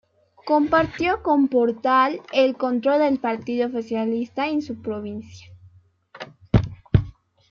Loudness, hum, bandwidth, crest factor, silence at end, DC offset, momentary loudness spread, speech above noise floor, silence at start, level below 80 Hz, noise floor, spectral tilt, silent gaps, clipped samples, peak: -22 LUFS; none; 7 kHz; 20 dB; 0.4 s; under 0.1%; 15 LU; 32 dB; 0.45 s; -40 dBFS; -53 dBFS; -8 dB/octave; none; under 0.1%; -2 dBFS